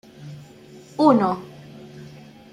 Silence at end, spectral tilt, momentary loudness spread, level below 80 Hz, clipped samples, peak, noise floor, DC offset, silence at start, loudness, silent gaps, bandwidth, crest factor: 0.45 s; -7.5 dB/octave; 26 LU; -64 dBFS; under 0.1%; -2 dBFS; -45 dBFS; under 0.1%; 0.2 s; -19 LUFS; none; 11 kHz; 22 dB